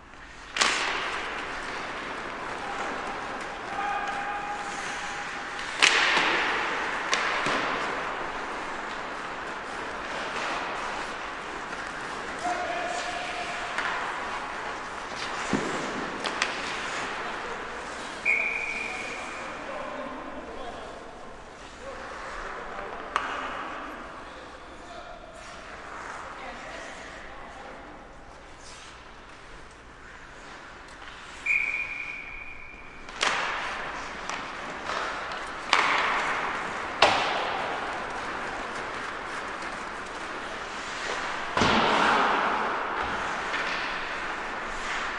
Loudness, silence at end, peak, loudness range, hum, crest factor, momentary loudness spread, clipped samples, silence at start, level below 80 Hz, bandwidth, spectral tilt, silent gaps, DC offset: -29 LUFS; 0 s; 0 dBFS; 15 LU; none; 30 dB; 19 LU; under 0.1%; 0 s; -52 dBFS; 11.5 kHz; -2 dB/octave; none; under 0.1%